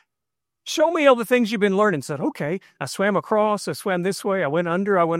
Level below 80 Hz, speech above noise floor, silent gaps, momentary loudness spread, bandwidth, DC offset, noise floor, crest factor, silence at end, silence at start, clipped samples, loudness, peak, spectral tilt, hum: -70 dBFS; 65 dB; none; 11 LU; 16 kHz; under 0.1%; -86 dBFS; 18 dB; 0 s; 0.65 s; under 0.1%; -21 LUFS; -4 dBFS; -5 dB/octave; none